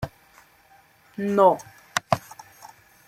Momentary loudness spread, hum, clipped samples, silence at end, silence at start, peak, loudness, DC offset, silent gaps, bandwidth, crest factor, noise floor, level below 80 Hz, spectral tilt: 24 LU; none; under 0.1%; 0.9 s; 0 s; -2 dBFS; -23 LUFS; under 0.1%; none; 16 kHz; 24 dB; -56 dBFS; -58 dBFS; -5 dB/octave